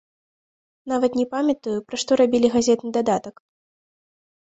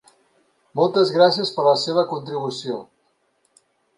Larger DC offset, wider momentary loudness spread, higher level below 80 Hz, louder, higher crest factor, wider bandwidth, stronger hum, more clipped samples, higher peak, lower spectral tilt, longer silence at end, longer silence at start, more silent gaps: neither; second, 9 LU vs 14 LU; first, -60 dBFS vs -72 dBFS; about the same, -21 LUFS vs -20 LUFS; about the same, 18 dB vs 20 dB; second, 8.2 kHz vs 11.5 kHz; neither; neither; second, -6 dBFS vs -2 dBFS; about the same, -4.5 dB/octave vs -5 dB/octave; about the same, 1.2 s vs 1.15 s; about the same, 0.85 s vs 0.75 s; neither